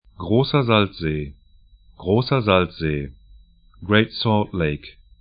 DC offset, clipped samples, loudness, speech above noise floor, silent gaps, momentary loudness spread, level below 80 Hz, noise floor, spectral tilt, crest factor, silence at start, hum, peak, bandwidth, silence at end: under 0.1%; under 0.1%; -20 LUFS; 32 dB; none; 15 LU; -42 dBFS; -52 dBFS; -11.5 dB/octave; 20 dB; 0.2 s; none; 0 dBFS; 5.2 kHz; 0.3 s